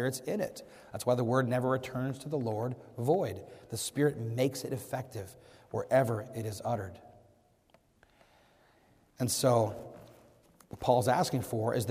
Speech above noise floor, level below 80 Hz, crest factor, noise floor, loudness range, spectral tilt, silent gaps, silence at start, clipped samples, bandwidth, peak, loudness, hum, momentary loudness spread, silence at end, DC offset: 35 dB; -66 dBFS; 20 dB; -67 dBFS; 4 LU; -5.5 dB/octave; none; 0 s; under 0.1%; 15.5 kHz; -14 dBFS; -32 LUFS; none; 15 LU; 0 s; under 0.1%